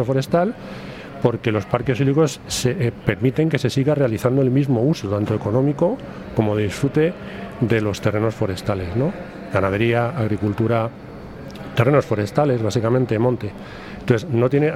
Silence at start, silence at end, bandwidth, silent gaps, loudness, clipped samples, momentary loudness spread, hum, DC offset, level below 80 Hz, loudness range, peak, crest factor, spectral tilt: 0 s; 0 s; 15.5 kHz; none; -20 LUFS; under 0.1%; 13 LU; none; under 0.1%; -48 dBFS; 2 LU; -2 dBFS; 18 dB; -7 dB/octave